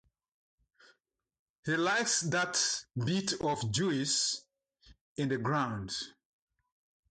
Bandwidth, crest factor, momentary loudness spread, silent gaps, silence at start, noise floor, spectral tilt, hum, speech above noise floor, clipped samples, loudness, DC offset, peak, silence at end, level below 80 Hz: 9.6 kHz; 16 dB; 10 LU; 5.01-5.16 s; 1.65 s; -74 dBFS; -3 dB/octave; none; 42 dB; under 0.1%; -32 LUFS; under 0.1%; -18 dBFS; 1 s; -66 dBFS